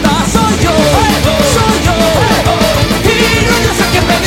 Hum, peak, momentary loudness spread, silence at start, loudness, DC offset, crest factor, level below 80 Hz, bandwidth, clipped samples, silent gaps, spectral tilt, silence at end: none; 0 dBFS; 2 LU; 0 s; -9 LUFS; under 0.1%; 10 dB; -20 dBFS; 17 kHz; 0.1%; none; -4.5 dB/octave; 0 s